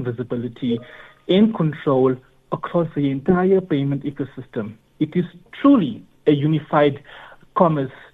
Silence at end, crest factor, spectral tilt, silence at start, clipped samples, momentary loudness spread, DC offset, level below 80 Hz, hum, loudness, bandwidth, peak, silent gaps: 0.2 s; 18 dB; -10 dB/octave; 0 s; under 0.1%; 13 LU; under 0.1%; -54 dBFS; none; -20 LUFS; 4.2 kHz; -2 dBFS; none